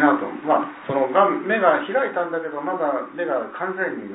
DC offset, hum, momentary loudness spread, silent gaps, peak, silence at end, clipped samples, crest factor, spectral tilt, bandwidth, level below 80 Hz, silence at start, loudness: under 0.1%; none; 8 LU; none; -2 dBFS; 0 s; under 0.1%; 18 dB; -9.5 dB/octave; 4 kHz; -76 dBFS; 0 s; -22 LUFS